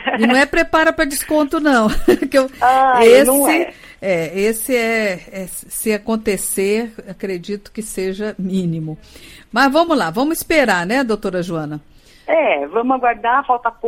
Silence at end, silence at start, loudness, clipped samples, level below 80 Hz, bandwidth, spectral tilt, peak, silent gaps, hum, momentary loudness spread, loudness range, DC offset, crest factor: 0 s; 0 s; -16 LUFS; under 0.1%; -38 dBFS; 16.5 kHz; -4 dB/octave; 0 dBFS; none; none; 14 LU; 8 LU; under 0.1%; 16 dB